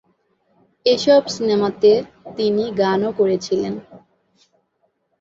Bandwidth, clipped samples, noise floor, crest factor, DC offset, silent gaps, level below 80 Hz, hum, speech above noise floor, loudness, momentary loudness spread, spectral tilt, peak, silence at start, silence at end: 7.8 kHz; under 0.1%; -68 dBFS; 16 dB; under 0.1%; none; -60 dBFS; none; 51 dB; -18 LUFS; 8 LU; -5 dB/octave; -2 dBFS; 0.85 s; 1.2 s